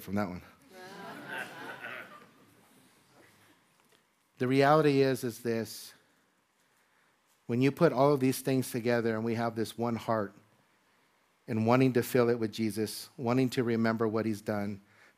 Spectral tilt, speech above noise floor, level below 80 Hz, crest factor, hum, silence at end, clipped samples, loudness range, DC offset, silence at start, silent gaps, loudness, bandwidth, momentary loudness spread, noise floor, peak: -6.5 dB/octave; 42 dB; -74 dBFS; 22 dB; none; 0.4 s; under 0.1%; 14 LU; under 0.1%; 0 s; none; -30 LUFS; 15.5 kHz; 19 LU; -71 dBFS; -10 dBFS